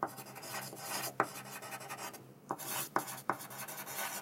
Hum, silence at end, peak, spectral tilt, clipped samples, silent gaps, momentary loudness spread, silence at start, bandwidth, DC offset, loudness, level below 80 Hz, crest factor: none; 0 s; -12 dBFS; -2 dB/octave; under 0.1%; none; 9 LU; 0 s; 16 kHz; under 0.1%; -40 LUFS; -84 dBFS; 30 dB